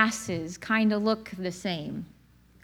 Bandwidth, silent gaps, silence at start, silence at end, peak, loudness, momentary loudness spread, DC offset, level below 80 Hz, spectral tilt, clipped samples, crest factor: 14.5 kHz; none; 0 s; 0.55 s; -10 dBFS; -29 LUFS; 13 LU; under 0.1%; -60 dBFS; -4.5 dB/octave; under 0.1%; 20 dB